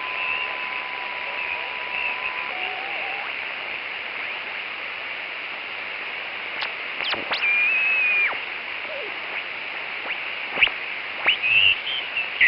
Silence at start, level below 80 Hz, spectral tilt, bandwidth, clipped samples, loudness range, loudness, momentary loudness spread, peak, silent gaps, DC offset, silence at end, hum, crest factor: 0 s; -64 dBFS; -5 dB/octave; 5.8 kHz; under 0.1%; 7 LU; -23 LUFS; 11 LU; -6 dBFS; none; under 0.1%; 0 s; none; 20 dB